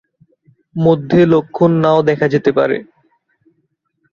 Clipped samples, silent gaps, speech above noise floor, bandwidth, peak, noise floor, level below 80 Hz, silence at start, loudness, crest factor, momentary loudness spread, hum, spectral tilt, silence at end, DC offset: under 0.1%; none; 54 dB; 7 kHz; 0 dBFS; -66 dBFS; -52 dBFS; 0.75 s; -14 LUFS; 16 dB; 6 LU; none; -8.5 dB/octave; 1.3 s; under 0.1%